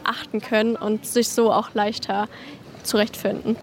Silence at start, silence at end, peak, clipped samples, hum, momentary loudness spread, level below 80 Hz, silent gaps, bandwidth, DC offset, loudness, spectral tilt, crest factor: 0 s; 0 s; -6 dBFS; under 0.1%; none; 11 LU; -60 dBFS; none; 16.5 kHz; under 0.1%; -23 LUFS; -3.5 dB/octave; 16 dB